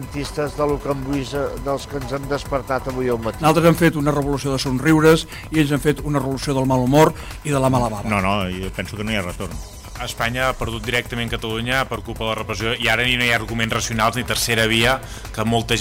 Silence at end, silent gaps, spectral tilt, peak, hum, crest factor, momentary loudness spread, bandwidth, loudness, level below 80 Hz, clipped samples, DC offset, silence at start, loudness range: 0 s; none; -5 dB/octave; -4 dBFS; none; 16 dB; 11 LU; 16 kHz; -20 LUFS; -36 dBFS; under 0.1%; under 0.1%; 0 s; 6 LU